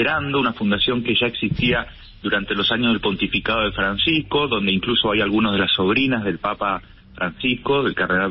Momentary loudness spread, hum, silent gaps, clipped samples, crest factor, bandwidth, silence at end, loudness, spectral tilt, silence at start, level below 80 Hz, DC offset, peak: 6 LU; none; none; under 0.1%; 12 dB; 5.8 kHz; 0 s; -20 LUFS; -10 dB/octave; 0 s; -42 dBFS; under 0.1%; -8 dBFS